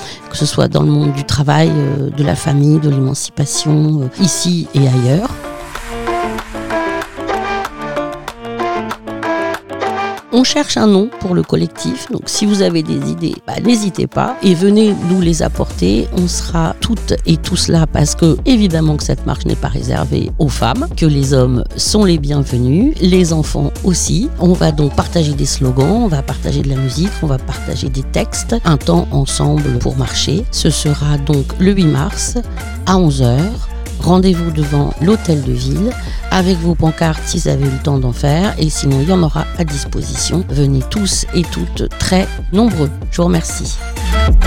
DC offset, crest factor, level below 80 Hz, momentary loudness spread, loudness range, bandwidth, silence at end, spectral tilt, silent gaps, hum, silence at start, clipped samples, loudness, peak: 1%; 14 dB; -22 dBFS; 8 LU; 3 LU; 16.5 kHz; 0 s; -5.5 dB/octave; none; none; 0 s; under 0.1%; -14 LUFS; 0 dBFS